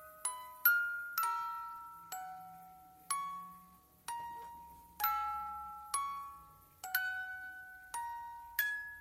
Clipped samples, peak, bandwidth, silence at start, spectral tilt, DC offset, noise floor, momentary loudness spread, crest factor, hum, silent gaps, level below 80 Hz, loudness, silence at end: under 0.1%; -16 dBFS; 16 kHz; 0 s; 0.5 dB/octave; under 0.1%; -62 dBFS; 18 LU; 24 dB; none; none; -72 dBFS; -38 LUFS; 0 s